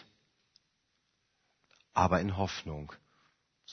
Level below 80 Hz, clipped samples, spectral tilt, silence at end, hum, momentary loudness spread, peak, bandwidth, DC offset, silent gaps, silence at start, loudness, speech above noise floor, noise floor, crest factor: -56 dBFS; under 0.1%; -5 dB/octave; 0 s; none; 16 LU; -12 dBFS; 6.4 kHz; under 0.1%; none; 1.95 s; -32 LUFS; 47 dB; -78 dBFS; 26 dB